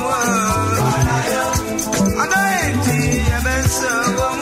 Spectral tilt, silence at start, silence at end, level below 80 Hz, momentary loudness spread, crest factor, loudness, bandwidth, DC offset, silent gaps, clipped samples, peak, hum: -4.5 dB/octave; 0 s; 0 s; -28 dBFS; 2 LU; 14 dB; -17 LUFS; 16 kHz; under 0.1%; none; under 0.1%; -4 dBFS; none